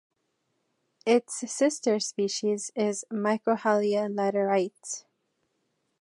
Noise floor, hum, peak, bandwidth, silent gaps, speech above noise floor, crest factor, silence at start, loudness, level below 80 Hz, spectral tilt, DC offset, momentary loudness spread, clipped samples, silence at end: -77 dBFS; none; -10 dBFS; 11.5 kHz; none; 50 dB; 18 dB; 1.05 s; -27 LUFS; -82 dBFS; -4 dB/octave; under 0.1%; 9 LU; under 0.1%; 1 s